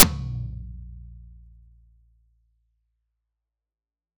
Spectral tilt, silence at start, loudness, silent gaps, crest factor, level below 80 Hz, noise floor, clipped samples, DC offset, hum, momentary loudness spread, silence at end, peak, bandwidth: -3 dB/octave; 0 s; -24 LUFS; none; 28 dB; -42 dBFS; under -90 dBFS; 0.1%; under 0.1%; none; 22 LU; 2.9 s; 0 dBFS; 11.5 kHz